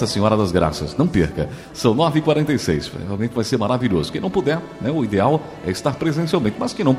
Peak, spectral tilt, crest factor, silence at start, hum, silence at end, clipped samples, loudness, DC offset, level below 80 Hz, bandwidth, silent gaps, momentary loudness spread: -2 dBFS; -6.5 dB/octave; 18 dB; 0 s; none; 0 s; under 0.1%; -20 LUFS; under 0.1%; -42 dBFS; 15 kHz; none; 6 LU